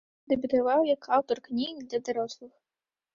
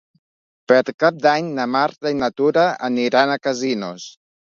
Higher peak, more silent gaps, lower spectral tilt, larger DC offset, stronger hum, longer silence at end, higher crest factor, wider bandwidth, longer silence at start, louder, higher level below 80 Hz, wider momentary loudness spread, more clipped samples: second, -12 dBFS vs -2 dBFS; second, none vs 0.94-0.98 s; about the same, -4.5 dB/octave vs -5 dB/octave; neither; neither; first, 0.7 s vs 0.45 s; about the same, 18 dB vs 18 dB; about the same, 7.4 kHz vs 7.6 kHz; second, 0.3 s vs 0.7 s; second, -28 LUFS vs -18 LUFS; about the same, -68 dBFS vs -64 dBFS; about the same, 9 LU vs 8 LU; neither